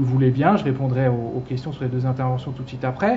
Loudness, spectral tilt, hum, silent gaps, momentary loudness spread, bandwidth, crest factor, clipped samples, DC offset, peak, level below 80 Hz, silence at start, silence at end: -22 LUFS; -9.5 dB/octave; none; none; 10 LU; 6 kHz; 18 dB; under 0.1%; under 0.1%; -4 dBFS; -50 dBFS; 0 s; 0 s